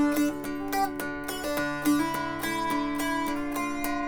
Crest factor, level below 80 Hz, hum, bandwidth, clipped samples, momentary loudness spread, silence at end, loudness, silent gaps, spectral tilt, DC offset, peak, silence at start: 16 dB; -50 dBFS; none; over 20 kHz; under 0.1%; 6 LU; 0 s; -29 LUFS; none; -4 dB/octave; under 0.1%; -12 dBFS; 0 s